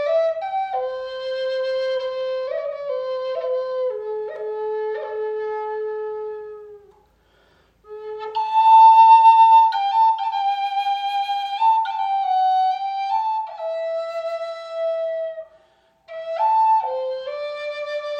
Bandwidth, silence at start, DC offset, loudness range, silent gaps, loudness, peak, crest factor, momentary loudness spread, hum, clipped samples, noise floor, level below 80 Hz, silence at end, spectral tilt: 6.6 kHz; 0 s; under 0.1%; 14 LU; none; -20 LUFS; -4 dBFS; 16 dB; 17 LU; none; under 0.1%; -59 dBFS; -70 dBFS; 0 s; -1.5 dB/octave